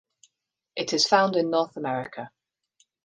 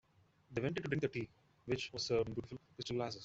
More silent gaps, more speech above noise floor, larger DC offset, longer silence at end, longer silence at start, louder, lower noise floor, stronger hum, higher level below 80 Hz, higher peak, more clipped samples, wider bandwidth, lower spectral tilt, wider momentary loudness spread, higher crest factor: neither; first, 56 dB vs 27 dB; neither; first, 0.75 s vs 0 s; first, 0.75 s vs 0.5 s; first, -24 LUFS vs -40 LUFS; first, -80 dBFS vs -66 dBFS; neither; second, -76 dBFS vs -66 dBFS; first, -6 dBFS vs -22 dBFS; neither; first, 10 kHz vs 8.2 kHz; second, -3.5 dB/octave vs -5.5 dB/octave; first, 18 LU vs 12 LU; about the same, 22 dB vs 20 dB